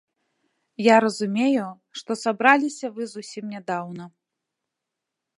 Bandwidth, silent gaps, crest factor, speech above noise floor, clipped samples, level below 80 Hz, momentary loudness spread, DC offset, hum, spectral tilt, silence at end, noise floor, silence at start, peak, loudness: 11.5 kHz; none; 24 dB; 62 dB; under 0.1%; -78 dBFS; 17 LU; under 0.1%; none; -4.5 dB/octave; 1.3 s; -84 dBFS; 0.8 s; 0 dBFS; -22 LUFS